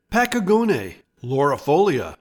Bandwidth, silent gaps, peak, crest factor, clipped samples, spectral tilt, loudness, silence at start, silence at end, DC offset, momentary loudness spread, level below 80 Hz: 19 kHz; none; -6 dBFS; 14 dB; under 0.1%; -6 dB/octave; -20 LUFS; 0.1 s; 0.05 s; under 0.1%; 10 LU; -50 dBFS